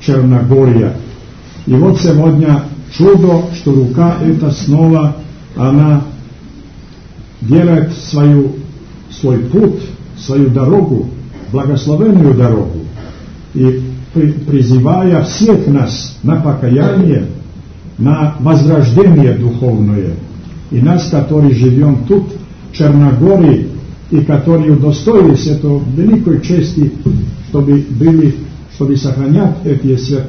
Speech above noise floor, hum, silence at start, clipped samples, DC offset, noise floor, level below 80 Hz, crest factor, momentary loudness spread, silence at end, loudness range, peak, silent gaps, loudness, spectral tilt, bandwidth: 24 dB; none; 0 s; 0.7%; 0.5%; -33 dBFS; -34 dBFS; 10 dB; 16 LU; 0 s; 3 LU; 0 dBFS; none; -10 LUFS; -8.5 dB/octave; 6.6 kHz